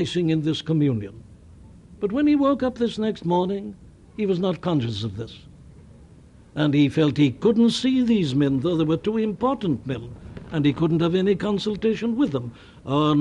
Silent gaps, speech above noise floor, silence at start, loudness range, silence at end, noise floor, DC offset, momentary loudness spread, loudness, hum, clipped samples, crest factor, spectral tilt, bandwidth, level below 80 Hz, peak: none; 27 dB; 0 s; 5 LU; 0 s; -49 dBFS; under 0.1%; 13 LU; -22 LUFS; none; under 0.1%; 16 dB; -7 dB/octave; 10.5 kHz; -50 dBFS; -8 dBFS